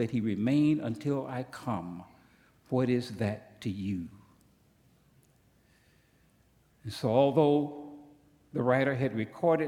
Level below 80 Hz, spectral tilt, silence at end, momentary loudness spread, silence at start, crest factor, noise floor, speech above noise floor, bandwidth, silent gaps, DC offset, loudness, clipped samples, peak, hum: -68 dBFS; -7.5 dB/octave; 0 s; 17 LU; 0 s; 20 dB; -66 dBFS; 37 dB; 15 kHz; none; under 0.1%; -30 LUFS; under 0.1%; -10 dBFS; none